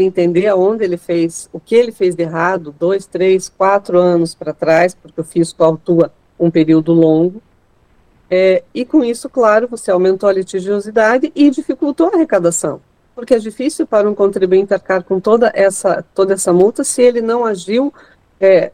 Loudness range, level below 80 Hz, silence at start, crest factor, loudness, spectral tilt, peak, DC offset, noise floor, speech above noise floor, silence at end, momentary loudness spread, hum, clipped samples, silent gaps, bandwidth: 2 LU; -54 dBFS; 0 s; 14 dB; -14 LUFS; -5.5 dB/octave; 0 dBFS; under 0.1%; -53 dBFS; 40 dB; 0.05 s; 7 LU; none; under 0.1%; none; 15 kHz